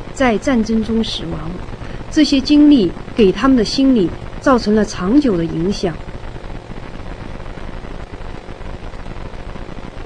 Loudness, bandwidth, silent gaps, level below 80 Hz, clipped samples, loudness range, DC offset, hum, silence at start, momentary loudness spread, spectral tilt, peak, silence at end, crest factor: -15 LUFS; 10 kHz; none; -30 dBFS; under 0.1%; 18 LU; under 0.1%; none; 0 s; 20 LU; -6 dB/octave; 0 dBFS; 0 s; 16 dB